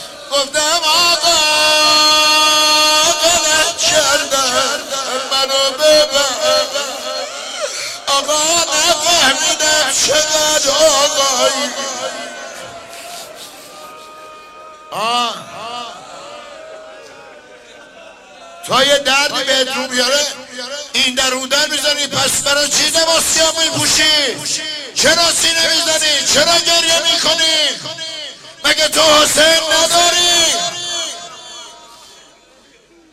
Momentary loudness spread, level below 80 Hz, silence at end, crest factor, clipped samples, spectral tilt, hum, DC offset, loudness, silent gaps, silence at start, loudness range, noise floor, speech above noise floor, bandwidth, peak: 18 LU; -48 dBFS; 1.15 s; 14 dB; under 0.1%; 0 dB/octave; none; under 0.1%; -12 LUFS; none; 0 s; 14 LU; -47 dBFS; 34 dB; 16 kHz; 0 dBFS